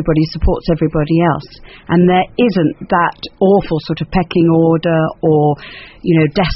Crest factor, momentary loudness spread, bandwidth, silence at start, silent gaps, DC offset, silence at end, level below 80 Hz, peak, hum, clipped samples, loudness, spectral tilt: 12 dB; 7 LU; 5.8 kHz; 0 s; none; under 0.1%; 0 s; -28 dBFS; 0 dBFS; none; under 0.1%; -14 LUFS; -6.5 dB/octave